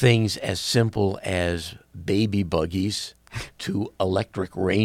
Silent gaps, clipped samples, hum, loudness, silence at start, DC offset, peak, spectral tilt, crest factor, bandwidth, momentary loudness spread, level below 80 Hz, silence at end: none; under 0.1%; none; -25 LUFS; 0 s; under 0.1%; -6 dBFS; -5.5 dB/octave; 18 dB; 15.5 kHz; 12 LU; -48 dBFS; 0 s